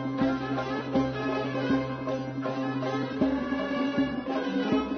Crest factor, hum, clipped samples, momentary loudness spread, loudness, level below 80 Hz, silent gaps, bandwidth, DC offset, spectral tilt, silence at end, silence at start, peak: 14 dB; none; under 0.1%; 4 LU; -29 LUFS; -54 dBFS; none; 6.4 kHz; under 0.1%; -7 dB/octave; 0 s; 0 s; -14 dBFS